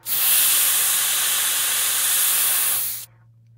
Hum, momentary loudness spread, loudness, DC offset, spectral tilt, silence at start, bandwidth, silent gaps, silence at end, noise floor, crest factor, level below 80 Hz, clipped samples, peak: none; 5 LU; -17 LUFS; under 0.1%; 2.5 dB/octave; 0.05 s; 16 kHz; none; 0.55 s; -52 dBFS; 16 dB; -68 dBFS; under 0.1%; -6 dBFS